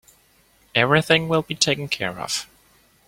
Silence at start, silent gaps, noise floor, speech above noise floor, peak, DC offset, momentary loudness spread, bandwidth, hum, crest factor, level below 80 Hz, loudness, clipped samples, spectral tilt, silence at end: 0.75 s; none; -58 dBFS; 37 dB; -2 dBFS; under 0.1%; 9 LU; 16.5 kHz; none; 22 dB; -56 dBFS; -21 LUFS; under 0.1%; -3.5 dB/octave; 0.65 s